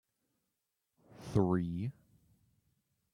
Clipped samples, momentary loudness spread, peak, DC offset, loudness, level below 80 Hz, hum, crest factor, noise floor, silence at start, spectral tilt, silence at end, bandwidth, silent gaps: under 0.1%; 13 LU; -16 dBFS; under 0.1%; -35 LUFS; -64 dBFS; none; 22 dB; -86 dBFS; 1.15 s; -9 dB/octave; 1.25 s; 11.5 kHz; none